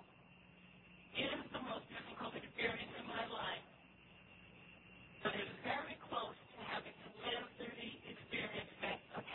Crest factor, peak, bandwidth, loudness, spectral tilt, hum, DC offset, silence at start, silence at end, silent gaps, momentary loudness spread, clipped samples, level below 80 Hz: 22 dB; -26 dBFS; 4.2 kHz; -45 LUFS; -1.5 dB/octave; none; under 0.1%; 0 s; 0 s; none; 20 LU; under 0.1%; -74 dBFS